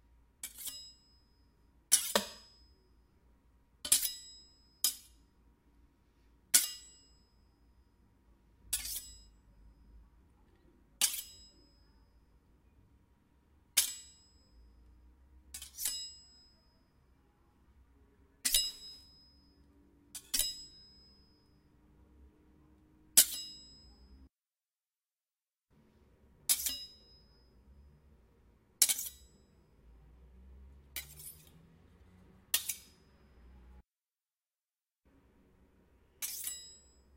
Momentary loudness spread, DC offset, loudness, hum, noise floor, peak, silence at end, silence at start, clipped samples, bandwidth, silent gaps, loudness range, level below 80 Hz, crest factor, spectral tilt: 25 LU; under 0.1%; -33 LUFS; none; under -90 dBFS; -6 dBFS; 0.4 s; 0.45 s; under 0.1%; 16 kHz; none; 11 LU; -64 dBFS; 34 dB; 1 dB/octave